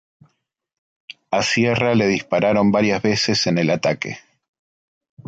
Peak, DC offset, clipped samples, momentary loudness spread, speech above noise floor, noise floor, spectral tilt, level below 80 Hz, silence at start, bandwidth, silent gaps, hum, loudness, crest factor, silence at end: -6 dBFS; under 0.1%; under 0.1%; 7 LU; 45 dB; -63 dBFS; -5 dB/octave; -54 dBFS; 1.3 s; 9 kHz; none; none; -18 LUFS; 14 dB; 1.1 s